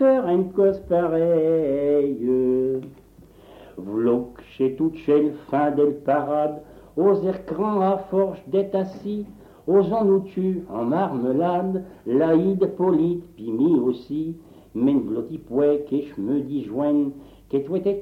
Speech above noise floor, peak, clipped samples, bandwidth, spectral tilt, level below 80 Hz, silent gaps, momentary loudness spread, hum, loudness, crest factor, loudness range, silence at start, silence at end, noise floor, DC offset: 28 dB; -8 dBFS; under 0.1%; 5.6 kHz; -9.5 dB/octave; -56 dBFS; none; 10 LU; none; -22 LUFS; 14 dB; 2 LU; 0 s; 0 s; -49 dBFS; under 0.1%